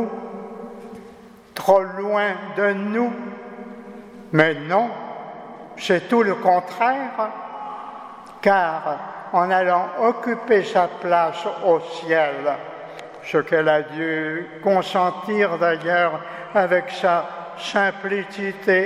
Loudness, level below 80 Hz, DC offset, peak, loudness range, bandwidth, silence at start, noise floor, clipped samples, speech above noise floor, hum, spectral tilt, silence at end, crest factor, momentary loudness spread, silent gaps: -21 LUFS; -68 dBFS; under 0.1%; 0 dBFS; 3 LU; 15.5 kHz; 0 s; -44 dBFS; under 0.1%; 24 dB; none; -5.5 dB/octave; 0 s; 22 dB; 18 LU; none